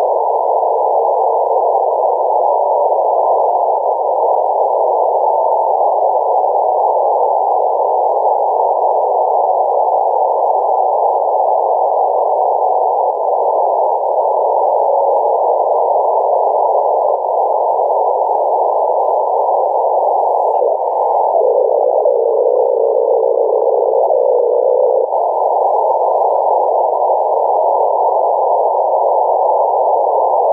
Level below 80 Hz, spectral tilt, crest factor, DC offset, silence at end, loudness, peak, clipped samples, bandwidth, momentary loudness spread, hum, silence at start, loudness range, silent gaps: -76 dBFS; -7 dB/octave; 10 dB; under 0.1%; 0 s; -13 LUFS; -4 dBFS; under 0.1%; 1.6 kHz; 1 LU; none; 0 s; 1 LU; none